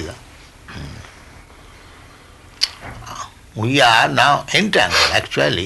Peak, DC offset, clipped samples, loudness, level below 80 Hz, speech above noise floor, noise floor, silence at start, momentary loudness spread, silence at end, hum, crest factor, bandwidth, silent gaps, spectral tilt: 0 dBFS; under 0.1%; under 0.1%; -15 LUFS; -44 dBFS; 28 dB; -43 dBFS; 0 s; 22 LU; 0 s; none; 18 dB; 12 kHz; none; -3 dB/octave